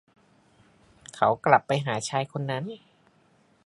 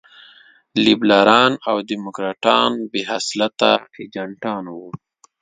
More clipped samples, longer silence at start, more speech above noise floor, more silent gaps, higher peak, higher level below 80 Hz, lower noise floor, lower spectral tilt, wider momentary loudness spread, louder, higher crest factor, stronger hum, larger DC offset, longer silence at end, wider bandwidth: neither; first, 1.15 s vs 0.75 s; first, 38 dB vs 31 dB; neither; about the same, -2 dBFS vs 0 dBFS; second, -68 dBFS vs -62 dBFS; first, -63 dBFS vs -49 dBFS; about the same, -5 dB/octave vs -4 dB/octave; about the same, 18 LU vs 18 LU; second, -25 LUFS vs -17 LUFS; first, 26 dB vs 18 dB; neither; neither; first, 0.9 s vs 0.45 s; first, 11.5 kHz vs 9.4 kHz